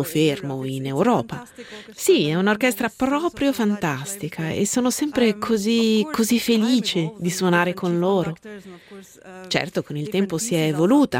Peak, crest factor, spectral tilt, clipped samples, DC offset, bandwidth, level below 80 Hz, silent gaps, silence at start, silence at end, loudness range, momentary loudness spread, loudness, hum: -4 dBFS; 16 dB; -5 dB/octave; under 0.1%; under 0.1%; 16.5 kHz; -58 dBFS; none; 0 s; 0 s; 4 LU; 11 LU; -21 LUFS; none